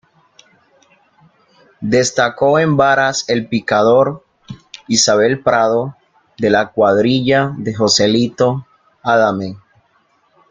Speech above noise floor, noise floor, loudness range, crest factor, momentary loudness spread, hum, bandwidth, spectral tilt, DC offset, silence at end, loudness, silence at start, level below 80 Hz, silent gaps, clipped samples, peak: 44 dB; -58 dBFS; 2 LU; 16 dB; 12 LU; none; 9.6 kHz; -4 dB/octave; under 0.1%; 0.95 s; -14 LUFS; 1.8 s; -52 dBFS; none; under 0.1%; 0 dBFS